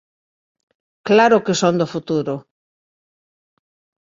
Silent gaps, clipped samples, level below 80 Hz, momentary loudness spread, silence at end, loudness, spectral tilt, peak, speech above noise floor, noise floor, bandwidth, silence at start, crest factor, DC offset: none; under 0.1%; -62 dBFS; 15 LU; 1.65 s; -17 LUFS; -5 dB/octave; -2 dBFS; over 74 dB; under -90 dBFS; 7.8 kHz; 1.05 s; 20 dB; under 0.1%